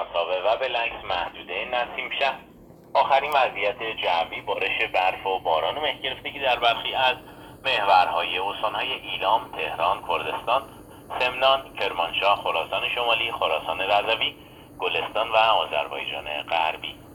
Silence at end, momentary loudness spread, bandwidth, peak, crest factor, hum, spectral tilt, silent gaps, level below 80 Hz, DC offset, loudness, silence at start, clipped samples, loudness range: 0 s; 8 LU; 18.5 kHz; -6 dBFS; 20 dB; none; -3.5 dB/octave; none; -56 dBFS; under 0.1%; -24 LUFS; 0 s; under 0.1%; 2 LU